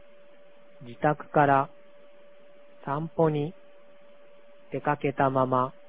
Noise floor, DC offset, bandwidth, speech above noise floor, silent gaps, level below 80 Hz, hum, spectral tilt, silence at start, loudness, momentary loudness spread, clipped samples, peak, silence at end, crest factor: -56 dBFS; 0.4%; 4 kHz; 30 dB; none; -66 dBFS; none; -11 dB/octave; 0.8 s; -27 LUFS; 14 LU; under 0.1%; -8 dBFS; 0.2 s; 22 dB